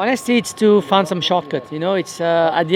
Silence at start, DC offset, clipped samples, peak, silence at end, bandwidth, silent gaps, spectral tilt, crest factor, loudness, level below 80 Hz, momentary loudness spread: 0 s; under 0.1%; under 0.1%; 0 dBFS; 0 s; 16 kHz; none; -5 dB/octave; 16 dB; -17 LUFS; -64 dBFS; 6 LU